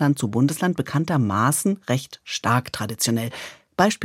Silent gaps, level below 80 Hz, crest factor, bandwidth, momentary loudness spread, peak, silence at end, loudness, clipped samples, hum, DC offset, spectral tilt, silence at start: none; -62 dBFS; 18 dB; 16.5 kHz; 10 LU; -4 dBFS; 0 s; -22 LUFS; under 0.1%; none; under 0.1%; -5 dB/octave; 0 s